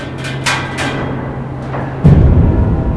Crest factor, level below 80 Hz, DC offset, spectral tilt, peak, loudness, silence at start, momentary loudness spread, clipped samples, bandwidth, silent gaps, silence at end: 12 dB; -18 dBFS; 0.3%; -6.5 dB/octave; 0 dBFS; -14 LUFS; 0 s; 13 LU; under 0.1%; 11 kHz; none; 0 s